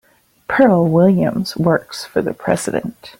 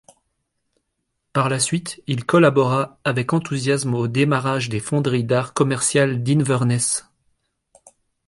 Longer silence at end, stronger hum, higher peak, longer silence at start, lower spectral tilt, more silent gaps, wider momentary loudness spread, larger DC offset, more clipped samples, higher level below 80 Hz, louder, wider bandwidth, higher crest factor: second, 0.1 s vs 1.25 s; neither; first, 0 dBFS vs -4 dBFS; second, 0.5 s vs 1.35 s; first, -6.5 dB/octave vs -5 dB/octave; neither; first, 10 LU vs 7 LU; neither; neither; first, -50 dBFS vs -58 dBFS; first, -16 LUFS vs -20 LUFS; first, 16.5 kHz vs 11.5 kHz; about the same, 16 dB vs 18 dB